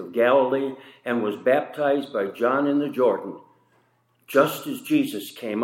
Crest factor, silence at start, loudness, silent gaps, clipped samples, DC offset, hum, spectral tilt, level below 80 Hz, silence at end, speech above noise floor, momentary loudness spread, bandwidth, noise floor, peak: 20 dB; 0 s; -23 LUFS; none; under 0.1%; under 0.1%; none; -5.5 dB/octave; -80 dBFS; 0 s; 42 dB; 12 LU; 16.5 kHz; -65 dBFS; -4 dBFS